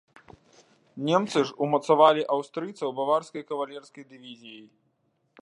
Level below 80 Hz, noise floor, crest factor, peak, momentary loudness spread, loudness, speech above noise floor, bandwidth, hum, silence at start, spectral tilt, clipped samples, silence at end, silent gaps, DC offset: -76 dBFS; -72 dBFS; 22 dB; -4 dBFS; 25 LU; -25 LUFS; 46 dB; 11 kHz; none; 0.95 s; -5.5 dB/octave; under 0.1%; 0.8 s; none; under 0.1%